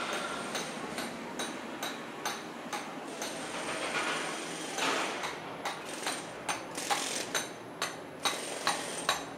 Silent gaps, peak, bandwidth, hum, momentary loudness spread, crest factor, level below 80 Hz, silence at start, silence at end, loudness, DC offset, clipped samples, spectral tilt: none; -12 dBFS; 16 kHz; none; 7 LU; 24 dB; -72 dBFS; 0 s; 0 s; -35 LUFS; under 0.1%; under 0.1%; -1.5 dB/octave